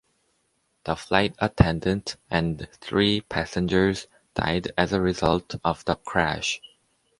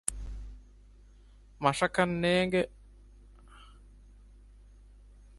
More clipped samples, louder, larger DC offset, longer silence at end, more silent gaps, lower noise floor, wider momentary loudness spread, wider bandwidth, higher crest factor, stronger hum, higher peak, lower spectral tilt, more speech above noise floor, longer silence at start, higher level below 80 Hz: neither; first, -25 LUFS vs -29 LUFS; neither; second, 0.65 s vs 1.65 s; neither; first, -71 dBFS vs -56 dBFS; second, 10 LU vs 19 LU; about the same, 11.5 kHz vs 12 kHz; second, 22 dB vs 28 dB; second, none vs 50 Hz at -55 dBFS; first, -2 dBFS vs -6 dBFS; about the same, -5.5 dB/octave vs -4.5 dB/octave; first, 47 dB vs 28 dB; first, 0.85 s vs 0.1 s; first, -42 dBFS vs -50 dBFS